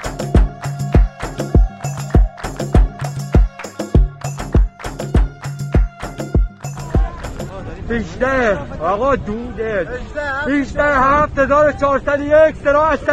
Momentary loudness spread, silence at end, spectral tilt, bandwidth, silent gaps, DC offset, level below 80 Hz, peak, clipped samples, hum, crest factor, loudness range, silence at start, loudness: 12 LU; 0 s; -7 dB/octave; 12 kHz; none; under 0.1%; -20 dBFS; -2 dBFS; under 0.1%; none; 14 dB; 6 LU; 0 s; -17 LUFS